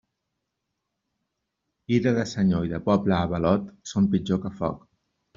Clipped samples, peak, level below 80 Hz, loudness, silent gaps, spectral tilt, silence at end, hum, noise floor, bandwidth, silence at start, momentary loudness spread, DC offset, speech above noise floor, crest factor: under 0.1%; -6 dBFS; -54 dBFS; -25 LUFS; none; -7 dB/octave; 0.6 s; none; -81 dBFS; 7.6 kHz; 1.9 s; 8 LU; under 0.1%; 57 dB; 20 dB